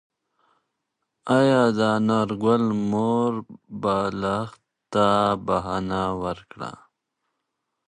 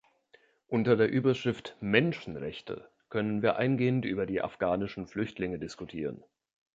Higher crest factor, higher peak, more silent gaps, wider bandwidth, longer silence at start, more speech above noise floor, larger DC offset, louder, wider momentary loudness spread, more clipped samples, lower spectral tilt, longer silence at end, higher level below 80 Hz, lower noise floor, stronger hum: about the same, 18 dB vs 22 dB; about the same, -6 dBFS vs -8 dBFS; neither; first, 10 kHz vs 7.8 kHz; first, 1.25 s vs 0.7 s; first, 57 dB vs 34 dB; neither; first, -23 LUFS vs -30 LUFS; first, 16 LU vs 13 LU; neither; about the same, -6.5 dB/octave vs -7.5 dB/octave; first, 1.1 s vs 0.55 s; first, -54 dBFS vs -62 dBFS; first, -80 dBFS vs -64 dBFS; neither